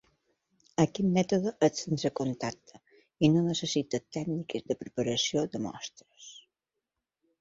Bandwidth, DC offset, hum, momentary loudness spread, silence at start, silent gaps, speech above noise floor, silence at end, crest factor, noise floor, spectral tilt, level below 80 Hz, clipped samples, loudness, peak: 7.8 kHz; under 0.1%; none; 17 LU; 0.8 s; none; 57 dB; 1 s; 22 dB; -87 dBFS; -5.5 dB/octave; -66 dBFS; under 0.1%; -30 LUFS; -10 dBFS